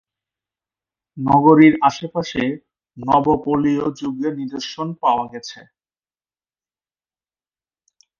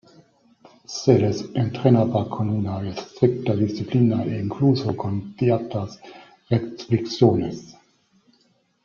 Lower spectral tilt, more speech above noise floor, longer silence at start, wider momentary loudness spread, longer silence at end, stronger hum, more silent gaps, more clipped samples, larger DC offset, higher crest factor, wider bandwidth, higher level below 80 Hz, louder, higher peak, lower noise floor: about the same, -6.5 dB/octave vs -7.5 dB/octave; first, over 73 dB vs 43 dB; first, 1.15 s vs 0.9 s; first, 17 LU vs 11 LU; first, 2.65 s vs 1.15 s; neither; neither; neither; neither; about the same, 20 dB vs 20 dB; about the same, 7.2 kHz vs 7.2 kHz; about the same, -54 dBFS vs -58 dBFS; first, -18 LUFS vs -22 LUFS; about the same, 0 dBFS vs -2 dBFS; first, under -90 dBFS vs -64 dBFS